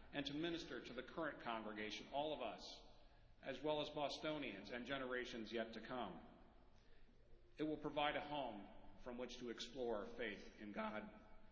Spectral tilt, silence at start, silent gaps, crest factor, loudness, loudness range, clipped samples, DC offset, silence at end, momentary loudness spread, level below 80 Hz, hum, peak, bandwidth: -2.5 dB/octave; 0 s; none; 22 dB; -48 LUFS; 3 LU; under 0.1%; under 0.1%; 0 s; 12 LU; -70 dBFS; none; -26 dBFS; 7.2 kHz